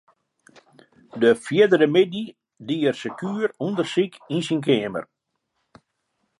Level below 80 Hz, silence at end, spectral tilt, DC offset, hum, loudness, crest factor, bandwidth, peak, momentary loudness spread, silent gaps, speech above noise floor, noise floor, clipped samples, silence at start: -70 dBFS; 1.35 s; -6 dB/octave; under 0.1%; none; -22 LUFS; 20 dB; 11.5 kHz; -4 dBFS; 15 LU; none; 55 dB; -76 dBFS; under 0.1%; 1.15 s